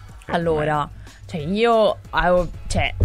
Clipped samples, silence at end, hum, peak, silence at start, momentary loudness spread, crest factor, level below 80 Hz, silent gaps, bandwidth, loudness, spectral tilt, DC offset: under 0.1%; 0 s; none; -6 dBFS; 0 s; 13 LU; 16 dB; -34 dBFS; none; 13.5 kHz; -21 LUFS; -5.5 dB/octave; under 0.1%